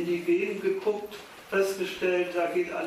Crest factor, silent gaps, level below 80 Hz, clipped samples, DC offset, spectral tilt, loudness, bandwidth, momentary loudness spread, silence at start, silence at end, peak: 14 dB; none; -68 dBFS; under 0.1%; under 0.1%; -5 dB/octave; -28 LUFS; 15.5 kHz; 7 LU; 0 s; 0 s; -14 dBFS